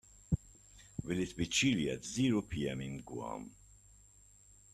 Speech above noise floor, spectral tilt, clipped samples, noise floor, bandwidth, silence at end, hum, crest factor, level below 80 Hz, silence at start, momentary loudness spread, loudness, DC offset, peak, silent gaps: 27 dB; -4.5 dB/octave; under 0.1%; -62 dBFS; 13.5 kHz; 1.2 s; 50 Hz at -60 dBFS; 20 dB; -56 dBFS; 0.3 s; 15 LU; -36 LUFS; under 0.1%; -18 dBFS; none